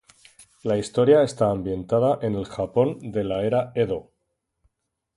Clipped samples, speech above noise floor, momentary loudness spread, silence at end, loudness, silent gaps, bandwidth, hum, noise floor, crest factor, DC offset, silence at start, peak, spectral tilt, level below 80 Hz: under 0.1%; 55 dB; 10 LU; 1.15 s; -23 LUFS; none; 11.5 kHz; none; -77 dBFS; 20 dB; under 0.1%; 0.65 s; -4 dBFS; -7 dB/octave; -52 dBFS